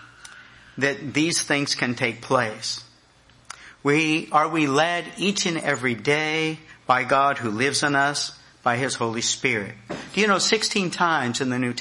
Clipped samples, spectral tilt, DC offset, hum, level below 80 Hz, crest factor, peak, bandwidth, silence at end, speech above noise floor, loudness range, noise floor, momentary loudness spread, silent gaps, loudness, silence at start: under 0.1%; -3.5 dB/octave; under 0.1%; none; -64 dBFS; 18 dB; -6 dBFS; 11.5 kHz; 0 s; 32 dB; 3 LU; -55 dBFS; 9 LU; none; -22 LUFS; 0 s